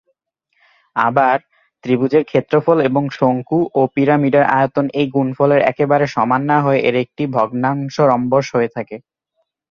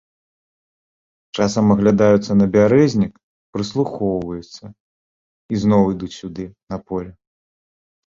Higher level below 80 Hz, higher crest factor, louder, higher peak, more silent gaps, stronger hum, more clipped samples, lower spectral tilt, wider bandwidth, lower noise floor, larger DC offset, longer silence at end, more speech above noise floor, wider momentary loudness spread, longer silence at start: second, -58 dBFS vs -48 dBFS; about the same, 14 dB vs 18 dB; about the same, -16 LUFS vs -17 LUFS; about the same, -2 dBFS vs -2 dBFS; second, none vs 3.23-3.53 s, 4.80-5.49 s, 6.63-6.67 s; neither; neither; about the same, -7.5 dB/octave vs -7 dB/octave; about the same, 7 kHz vs 7.6 kHz; second, -70 dBFS vs under -90 dBFS; neither; second, 0.75 s vs 1.05 s; second, 55 dB vs over 73 dB; second, 6 LU vs 18 LU; second, 0.95 s vs 1.35 s